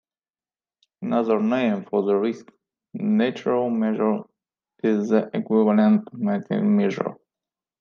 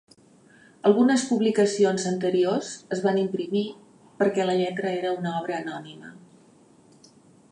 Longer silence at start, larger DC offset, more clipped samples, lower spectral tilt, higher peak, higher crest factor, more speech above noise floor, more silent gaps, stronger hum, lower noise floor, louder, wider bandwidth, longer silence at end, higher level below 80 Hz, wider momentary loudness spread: first, 1 s vs 0.85 s; neither; neither; first, -8 dB/octave vs -5.5 dB/octave; about the same, -6 dBFS vs -6 dBFS; about the same, 18 dB vs 18 dB; first, over 69 dB vs 32 dB; neither; neither; first, under -90 dBFS vs -55 dBFS; about the same, -22 LUFS vs -24 LUFS; second, 6.6 kHz vs 11 kHz; second, 0.65 s vs 1.35 s; about the same, -76 dBFS vs -76 dBFS; about the same, 10 LU vs 11 LU